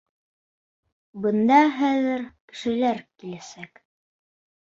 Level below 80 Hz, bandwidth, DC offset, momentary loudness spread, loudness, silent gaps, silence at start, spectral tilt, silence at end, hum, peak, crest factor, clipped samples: -68 dBFS; 7.8 kHz; under 0.1%; 21 LU; -22 LUFS; 2.40-2.48 s; 1.15 s; -5.5 dB/octave; 1 s; none; -6 dBFS; 20 dB; under 0.1%